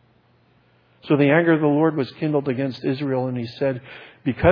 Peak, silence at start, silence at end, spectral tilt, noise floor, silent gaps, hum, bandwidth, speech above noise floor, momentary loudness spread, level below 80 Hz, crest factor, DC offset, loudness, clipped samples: -2 dBFS; 1.05 s; 0 s; -9.5 dB/octave; -59 dBFS; none; none; 5.4 kHz; 39 dB; 11 LU; -48 dBFS; 20 dB; under 0.1%; -21 LUFS; under 0.1%